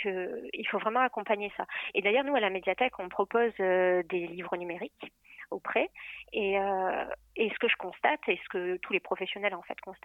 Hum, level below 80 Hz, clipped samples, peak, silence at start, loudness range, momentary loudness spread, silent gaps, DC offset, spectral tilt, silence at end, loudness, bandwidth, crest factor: none; -68 dBFS; under 0.1%; -12 dBFS; 0 s; 4 LU; 12 LU; none; under 0.1%; -6.5 dB/octave; 0.1 s; -31 LUFS; 4 kHz; 18 dB